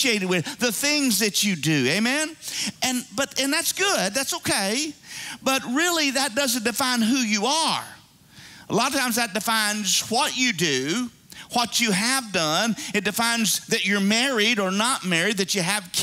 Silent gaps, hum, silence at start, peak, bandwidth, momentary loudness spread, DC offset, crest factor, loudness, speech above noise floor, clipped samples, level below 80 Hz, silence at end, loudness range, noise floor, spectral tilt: none; none; 0 s; -6 dBFS; 16 kHz; 6 LU; under 0.1%; 18 dB; -22 LUFS; 26 dB; under 0.1%; -64 dBFS; 0 s; 2 LU; -49 dBFS; -2.5 dB/octave